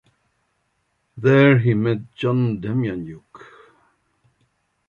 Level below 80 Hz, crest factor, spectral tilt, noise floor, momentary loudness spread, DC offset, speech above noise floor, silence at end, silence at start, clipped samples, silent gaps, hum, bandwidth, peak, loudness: -56 dBFS; 18 dB; -9 dB/octave; -70 dBFS; 17 LU; under 0.1%; 52 dB; 1.5 s; 1.15 s; under 0.1%; none; none; 6.8 kHz; -4 dBFS; -19 LUFS